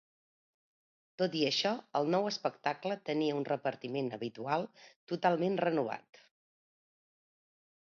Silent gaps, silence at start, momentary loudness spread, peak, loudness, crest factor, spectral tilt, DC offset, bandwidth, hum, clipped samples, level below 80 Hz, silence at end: 4.96-5.07 s; 1.2 s; 8 LU; -16 dBFS; -34 LUFS; 20 dB; -3.5 dB/octave; under 0.1%; 7.2 kHz; none; under 0.1%; -84 dBFS; 1.95 s